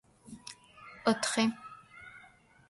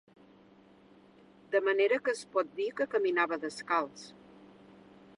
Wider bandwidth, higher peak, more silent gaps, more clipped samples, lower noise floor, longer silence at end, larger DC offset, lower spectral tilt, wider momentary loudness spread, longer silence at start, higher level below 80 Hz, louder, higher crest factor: about the same, 11.5 kHz vs 11 kHz; about the same, -14 dBFS vs -14 dBFS; neither; neither; about the same, -60 dBFS vs -59 dBFS; second, 0.5 s vs 0.7 s; neither; about the same, -3 dB/octave vs -3.5 dB/octave; first, 22 LU vs 10 LU; second, 0.3 s vs 1.5 s; first, -72 dBFS vs -80 dBFS; about the same, -31 LUFS vs -31 LUFS; about the same, 22 dB vs 20 dB